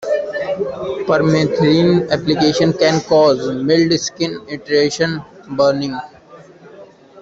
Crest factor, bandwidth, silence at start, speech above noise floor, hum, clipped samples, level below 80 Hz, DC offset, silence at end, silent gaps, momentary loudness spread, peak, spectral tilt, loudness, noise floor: 14 dB; 8 kHz; 0 s; 26 dB; none; under 0.1%; -52 dBFS; under 0.1%; 0 s; none; 10 LU; -2 dBFS; -5.5 dB/octave; -16 LUFS; -41 dBFS